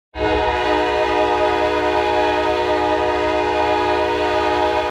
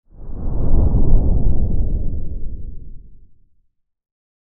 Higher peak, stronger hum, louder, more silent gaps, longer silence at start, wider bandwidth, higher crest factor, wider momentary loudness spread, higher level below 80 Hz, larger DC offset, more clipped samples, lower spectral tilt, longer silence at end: second, -4 dBFS vs 0 dBFS; neither; first, -18 LUFS vs -22 LUFS; neither; about the same, 0.15 s vs 0.2 s; first, 12.5 kHz vs 1.3 kHz; about the same, 12 dB vs 14 dB; second, 1 LU vs 19 LU; second, -38 dBFS vs -18 dBFS; neither; neither; second, -5 dB/octave vs -16 dB/octave; second, 0 s vs 1.4 s